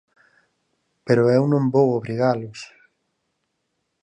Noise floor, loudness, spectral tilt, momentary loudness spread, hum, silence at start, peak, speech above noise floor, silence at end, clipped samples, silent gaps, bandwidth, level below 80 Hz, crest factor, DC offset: -75 dBFS; -20 LUFS; -8 dB/octave; 22 LU; none; 1.05 s; -4 dBFS; 56 dB; 1.35 s; under 0.1%; none; 9.6 kHz; -68 dBFS; 18 dB; under 0.1%